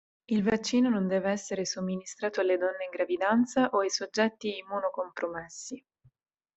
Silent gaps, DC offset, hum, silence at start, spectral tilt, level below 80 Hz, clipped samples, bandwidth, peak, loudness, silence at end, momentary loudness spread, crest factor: none; under 0.1%; none; 0.3 s; -4.5 dB/octave; -68 dBFS; under 0.1%; 8.2 kHz; -12 dBFS; -29 LUFS; 0.75 s; 10 LU; 18 dB